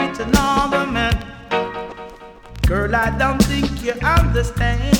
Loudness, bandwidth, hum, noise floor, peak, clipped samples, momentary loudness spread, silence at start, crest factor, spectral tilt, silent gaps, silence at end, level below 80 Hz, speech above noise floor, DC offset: -19 LUFS; 19.5 kHz; none; -38 dBFS; -2 dBFS; under 0.1%; 13 LU; 0 s; 16 dB; -5.5 dB/octave; none; 0 s; -24 dBFS; 21 dB; under 0.1%